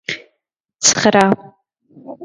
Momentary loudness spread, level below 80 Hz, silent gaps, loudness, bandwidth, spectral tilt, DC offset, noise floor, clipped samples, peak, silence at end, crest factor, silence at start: 15 LU; -58 dBFS; 0.60-0.64 s; -14 LUFS; 11.5 kHz; -2.5 dB/octave; under 0.1%; -74 dBFS; under 0.1%; 0 dBFS; 0 s; 18 dB; 0.1 s